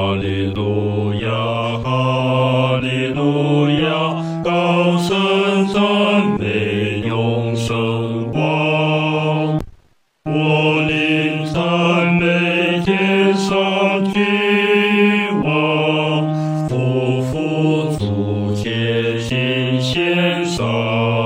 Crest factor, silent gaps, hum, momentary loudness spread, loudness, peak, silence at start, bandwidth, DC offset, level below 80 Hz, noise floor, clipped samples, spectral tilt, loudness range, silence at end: 14 dB; none; none; 5 LU; -17 LUFS; -2 dBFS; 0 s; 16 kHz; under 0.1%; -46 dBFS; -54 dBFS; under 0.1%; -6.5 dB/octave; 3 LU; 0 s